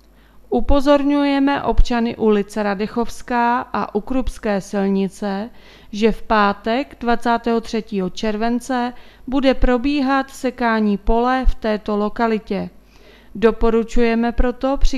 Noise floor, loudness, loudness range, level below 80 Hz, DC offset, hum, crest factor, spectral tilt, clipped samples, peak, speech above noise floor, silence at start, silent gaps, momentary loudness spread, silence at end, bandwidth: -46 dBFS; -19 LUFS; 2 LU; -28 dBFS; under 0.1%; none; 18 dB; -6 dB/octave; under 0.1%; 0 dBFS; 29 dB; 0.5 s; none; 8 LU; 0 s; 12.5 kHz